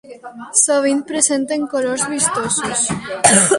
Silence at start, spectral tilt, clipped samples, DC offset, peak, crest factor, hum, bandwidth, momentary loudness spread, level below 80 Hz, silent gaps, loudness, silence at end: 0.05 s; -2.5 dB/octave; under 0.1%; under 0.1%; 0 dBFS; 18 dB; none; 11.5 kHz; 7 LU; -54 dBFS; none; -16 LUFS; 0 s